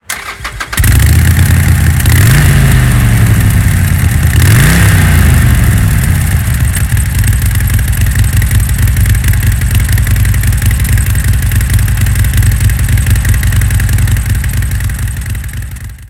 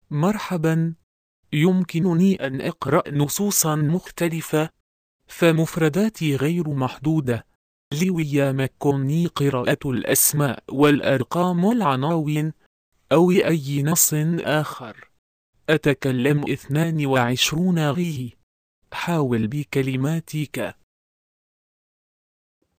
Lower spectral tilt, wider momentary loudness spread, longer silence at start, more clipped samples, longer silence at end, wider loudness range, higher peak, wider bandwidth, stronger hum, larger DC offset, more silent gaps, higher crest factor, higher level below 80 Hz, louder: about the same, -5 dB/octave vs -5 dB/octave; about the same, 8 LU vs 10 LU; about the same, 0.1 s vs 0.1 s; first, 0.9% vs under 0.1%; second, 0.05 s vs 2.05 s; about the same, 3 LU vs 5 LU; about the same, 0 dBFS vs -2 dBFS; first, 17.5 kHz vs 15.5 kHz; neither; neither; second, none vs 1.03-1.43 s, 4.80-5.19 s, 7.55-7.91 s, 12.66-12.92 s, 15.18-15.53 s, 18.43-18.82 s; second, 8 dB vs 20 dB; first, -14 dBFS vs -56 dBFS; first, -9 LUFS vs -21 LUFS